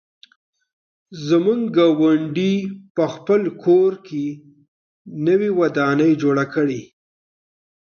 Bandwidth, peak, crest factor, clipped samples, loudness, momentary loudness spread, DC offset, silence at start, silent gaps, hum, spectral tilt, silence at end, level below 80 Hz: 6.8 kHz; -4 dBFS; 14 dB; under 0.1%; -19 LUFS; 11 LU; under 0.1%; 1.1 s; 2.90-2.95 s, 4.68-5.05 s; none; -7.5 dB/octave; 1.1 s; -68 dBFS